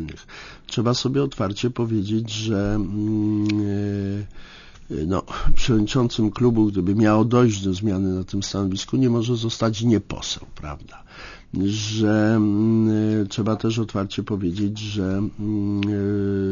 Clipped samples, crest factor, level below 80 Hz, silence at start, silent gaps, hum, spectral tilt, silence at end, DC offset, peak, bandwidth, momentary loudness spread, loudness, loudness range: under 0.1%; 16 dB; -34 dBFS; 0 s; none; none; -6.5 dB/octave; 0 s; under 0.1%; -4 dBFS; 7.4 kHz; 11 LU; -22 LUFS; 4 LU